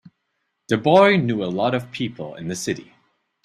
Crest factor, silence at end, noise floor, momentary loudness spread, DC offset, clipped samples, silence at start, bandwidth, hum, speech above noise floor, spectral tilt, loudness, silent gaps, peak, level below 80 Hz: 20 dB; 0.65 s; -74 dBFS; 15 LU; under 0.1%; under 0.1%; 0.7 s; 13 kHz; none; 55 dB; -5.5 dB/octave; -20 LUFS; none; -2 dBFS; -62 dBFS